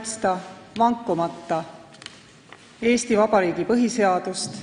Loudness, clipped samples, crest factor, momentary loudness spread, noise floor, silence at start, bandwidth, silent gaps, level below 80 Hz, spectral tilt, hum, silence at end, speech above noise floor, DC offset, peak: -22 LUFS; under 0.1%; 18 dB; 21 LU; -48 dBFS; 0 s; 10.5 kHz; none; -60 dBFS; -4.5 dB/octave; none; 0 s; 26 dB; under 0.1%; -6 dBFS